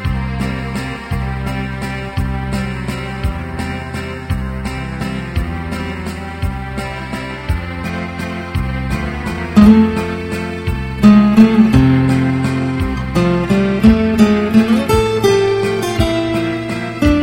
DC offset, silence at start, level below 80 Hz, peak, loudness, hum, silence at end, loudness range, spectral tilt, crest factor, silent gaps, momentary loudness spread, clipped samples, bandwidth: under 0.1%; 0 s; -26 dBFS; 0 dBFS; -16 LUFS; none; 0 s; 11 LU; -7 dB/octave; 14 dB; none; 13 LU; 0.2%; 16 kHz